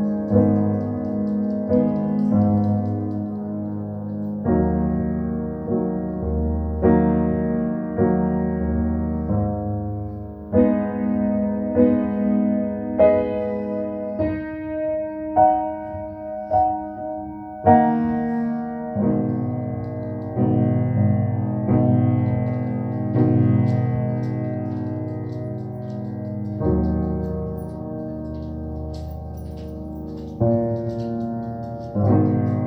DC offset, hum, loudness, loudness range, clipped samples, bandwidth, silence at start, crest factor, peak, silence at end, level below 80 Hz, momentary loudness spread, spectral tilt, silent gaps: under 0.1%; none; -22 LUFS; 6 LU; under 0.1%; 5.4 kHz; 0 s; 20 dB; -2 dBFS; 0 s; -38 dBFS; 12 LU; -12 dB/octave; none